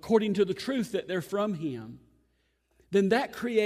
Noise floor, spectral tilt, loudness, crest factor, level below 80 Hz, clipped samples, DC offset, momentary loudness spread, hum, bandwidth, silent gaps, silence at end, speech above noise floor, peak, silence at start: -72 dBFS; -6 dB/octave; -29 LUFS; 18 dB; -66 dBFS; under 0.1%; under 0.1%; 11 LU; none; 15.5 kHz; none; 0 s; 44 dB; -10 dBFS; 0.05 s